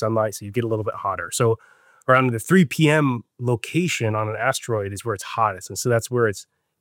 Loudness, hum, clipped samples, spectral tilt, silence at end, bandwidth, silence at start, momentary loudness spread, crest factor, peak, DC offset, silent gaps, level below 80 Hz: -22 LUFS; none; under 0.1%; -5.5 dB/octave; 0.4 s; 17 kHz; 0 s; 9 LU; 18 dB; -4 dBFS; under 0.1%; none; -66 dBFS